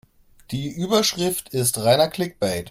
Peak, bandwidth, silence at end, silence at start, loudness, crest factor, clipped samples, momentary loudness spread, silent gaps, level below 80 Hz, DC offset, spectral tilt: -4 dBFS; 16.5 kHz; 0 s; 0.5 s; -21 LUFS; 18 dB; under 0.1%; 11 LU; none; -54 dBFS; under 0.1%; -4 dB/octave